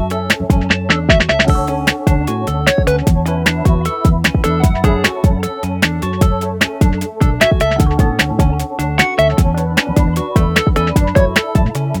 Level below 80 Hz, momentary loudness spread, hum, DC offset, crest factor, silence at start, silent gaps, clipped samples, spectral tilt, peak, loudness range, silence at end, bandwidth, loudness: -20 dBFS; 4 LU; none; under 0.1%; 14 dB; 0 s; none; under 0.1%; -6 dB/octave; 0 dBFS; 1 LU; 0 s; 19.5 kHz; -14 LUFS